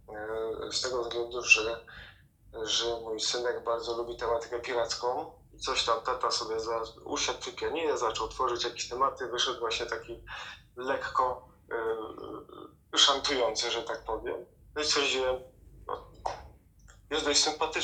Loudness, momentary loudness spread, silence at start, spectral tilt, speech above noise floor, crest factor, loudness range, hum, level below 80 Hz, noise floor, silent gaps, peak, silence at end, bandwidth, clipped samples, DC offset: -30 LUFS; 16 LU; 0.1 s; -1 dB/octave; 26 dB; 26 dB; 4 LU; none; -56 dBFS; -57 dBFS; none; -6 dBFS; 0 s; 13.5 kHz; under 0.1%; under 0.1%